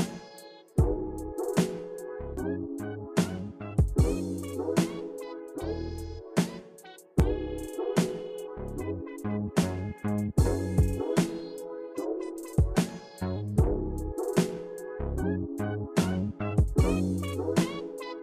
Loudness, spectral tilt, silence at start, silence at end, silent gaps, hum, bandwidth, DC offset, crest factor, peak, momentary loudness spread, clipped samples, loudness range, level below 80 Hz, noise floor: -31 LUFS; -6.5 dB/octave; 0 s; 0 s; none; none; 16 kHz; under 0.1%; 18 dB; -12 dBFS; 11 LU; under 0.1%; 3 LU; -38 dBFS; -50 dBFS